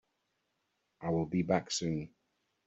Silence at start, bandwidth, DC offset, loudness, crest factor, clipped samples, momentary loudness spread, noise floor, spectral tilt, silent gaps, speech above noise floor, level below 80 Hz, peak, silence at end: 1 s; 8 kHz; under 0.1%; -34 LUFS; 22 dB; under 0.1%; 10 LU; -81 dBFS; -5.5 dB/octave; none; 48 dB; -66 dBFS; -14 dBFS; 0.6 s